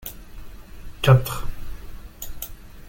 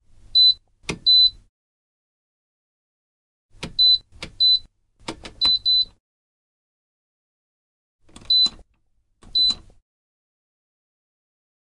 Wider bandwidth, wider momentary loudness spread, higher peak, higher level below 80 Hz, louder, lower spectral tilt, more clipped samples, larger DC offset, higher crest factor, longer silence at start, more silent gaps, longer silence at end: first, 17 kHz vs 11.5 kHz; first, 27 LU vs 20 LU; first, -2 dBFS vs -8 dBFS; first, -36 dBFS vs -52 dBFS; second, -21 LUFS vs -17 LUFS; first, -6 dB/octave vs -1.5 dB/octave; neither; neither; first, 22 dB vs 16 dB; second, 0 s vs 0.35 s; second, none vs 1.49-3.49 s, 6.00-7.99 s; second, 0 s vs 2.25 s